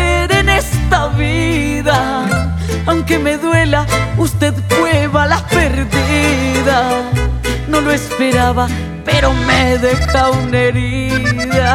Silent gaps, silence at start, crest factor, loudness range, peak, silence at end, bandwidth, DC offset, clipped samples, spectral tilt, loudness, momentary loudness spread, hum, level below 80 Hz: none; 0 s; 12 dB; 1 LU; 0 dBFS; 0 s; 17 kHz; under 0.1%; under 0.1%; -5 dB/octave; -13 LUFS; 4 LU; none; -22 dBFS